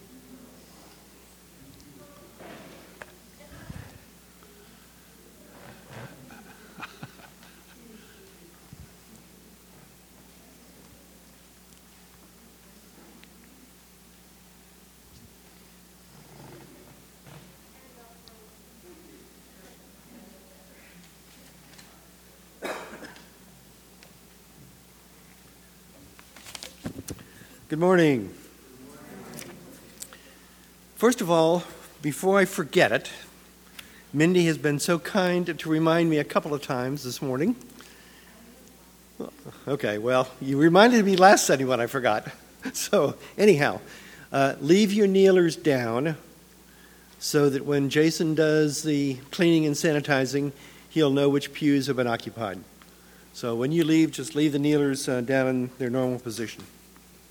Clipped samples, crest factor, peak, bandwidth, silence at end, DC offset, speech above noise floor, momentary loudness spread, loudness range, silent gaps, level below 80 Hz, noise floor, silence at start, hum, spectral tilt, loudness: under 0.1%; 26 dB; -2 dBFS; over 20 kHz; 0.65 s; under 0.1%; 31 dB; 25 LU; 25 LU; none; -62 dBFS; -53 dBFS; 0.3 s; none; -5 dB/octave; -23 LUFS